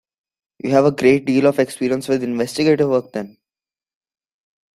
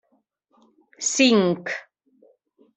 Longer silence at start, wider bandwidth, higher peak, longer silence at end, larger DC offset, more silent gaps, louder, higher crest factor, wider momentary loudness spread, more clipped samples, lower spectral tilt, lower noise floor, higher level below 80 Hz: second, 0.65 s vs 1 s; first, 14 kHz vs 8.4 kHz; about the same, -2 dBFS vs -4 dBFS; first, 1.5 s vs 0.95 s; neither; neither; first, -17 LUFS vs -21 LUFS; about the same, 18 dB vs 20 dB; about the same, 14 LU vs 14 LU; neither; first, -6 dB/octave vs -3.5 dB/octave; first, under -90 dBFS vs -69 dBFS; first, -58 dBFS vs -72 dBFS